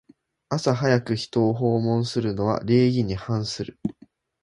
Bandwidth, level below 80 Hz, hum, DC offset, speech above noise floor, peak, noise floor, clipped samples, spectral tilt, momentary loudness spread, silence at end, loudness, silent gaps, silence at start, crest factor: 11.5 kHz; -52 dBFS; none; under 0.1%; 33 dB; -6 dBFS; -55 dBFS; under 0.1%; -6.5 dB/octave; 10 LU; 0.5 s; -24 LUFS; none; 0.5 s; 18 dB